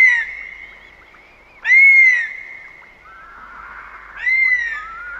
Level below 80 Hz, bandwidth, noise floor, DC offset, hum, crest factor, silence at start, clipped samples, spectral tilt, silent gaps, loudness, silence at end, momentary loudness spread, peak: -54 dBFS; 8 kHz; -46 dBFS; under 0.1%; none; 14 dB; 0 s; under 0.1%; 0 dB/octave; none; -12 LUFS; 0 s; 28 LU; -4 dBFS